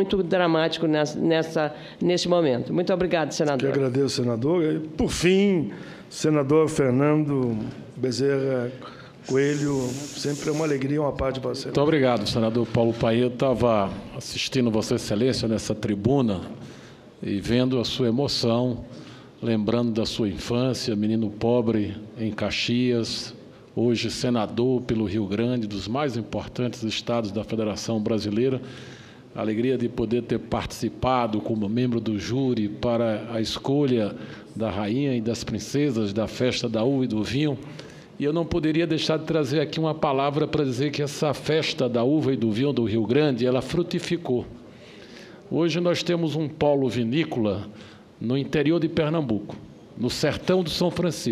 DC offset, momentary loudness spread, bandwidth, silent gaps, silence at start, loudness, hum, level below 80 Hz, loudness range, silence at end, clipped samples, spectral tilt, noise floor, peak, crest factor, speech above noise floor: under 0.1%; 9 LU; 14.5 kHz; none; 0 s; -24 LUFS; none; -50 dBFS; 3 LU; 0 s; under 0.1%; -6 dB/octave; -45 dBFS; -6 dBFS; 18 dB; 22 dB